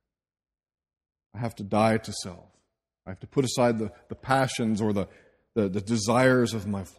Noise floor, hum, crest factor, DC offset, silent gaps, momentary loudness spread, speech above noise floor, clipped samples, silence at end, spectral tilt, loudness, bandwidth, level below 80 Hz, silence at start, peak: -75 dBFS; none; 22 dB; under 0.1%; none; 17 LU; 49 dB; under 0.1%; 0.1 s; -5.5 dB/octave; -26 LUFS; 14.5 kHz; -60 dBFS; 1.35 s; -6 dBFS